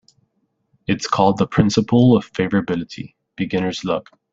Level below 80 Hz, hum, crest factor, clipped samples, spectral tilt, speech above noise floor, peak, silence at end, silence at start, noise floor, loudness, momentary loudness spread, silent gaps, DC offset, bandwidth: -52 dBFS; none; 18 dB; under 0.1%; -6.5 dB/octave; 51 dB; -2 dBFS; 0.3 s; 0.9 s; -68 dBFS; -19 LUFS; 16 LU; none; under 0.1%; 7.8 kHz